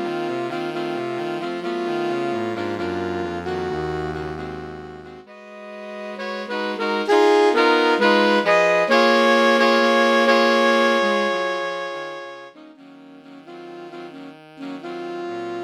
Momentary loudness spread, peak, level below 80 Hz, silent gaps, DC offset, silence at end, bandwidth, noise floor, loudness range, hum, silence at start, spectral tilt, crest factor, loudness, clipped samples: 21 LU; -4 dBFS; -54 dBFS; none; under 0.1%; 0 s; 13.5 kHz; -44 dBFS; 14 LU; none; 0 s; -4.5 dB/octave; 18 dB; -19 LUFS; under 0.1%